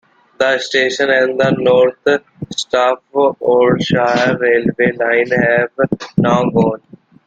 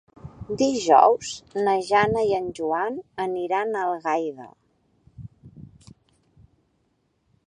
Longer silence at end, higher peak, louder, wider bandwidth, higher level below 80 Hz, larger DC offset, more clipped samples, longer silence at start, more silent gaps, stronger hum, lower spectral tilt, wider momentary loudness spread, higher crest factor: second, 0.5 s vs 1.8 s; about the same, -2 dBFS vs -2 dBFS; first, -14 LUFS vs -23 LUFS; second, 9 kHz vs 10.5 kHz; first, -50 dBFS vs -58 dBFS; neither; neither; first, 0.4 s vs 0.25 s; neither; neither; about the same, -5.5 dB/octave vs -4.5 dB/octave; second, 6 LU vs 26 LU; second, 12 dB vs 24 dB